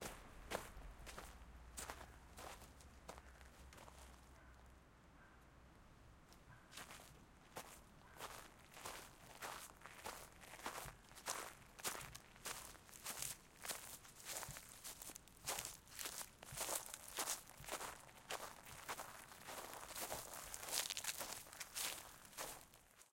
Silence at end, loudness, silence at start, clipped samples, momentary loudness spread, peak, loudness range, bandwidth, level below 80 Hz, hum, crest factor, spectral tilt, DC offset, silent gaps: 0 s; -50 LUFS; 0 s; under 0.1%; 19 LU; -20 dBFS; 15 LU; 17 kHz; -68 dBFS; none; 32 dB; -1 dB/octave; under 0.1%; none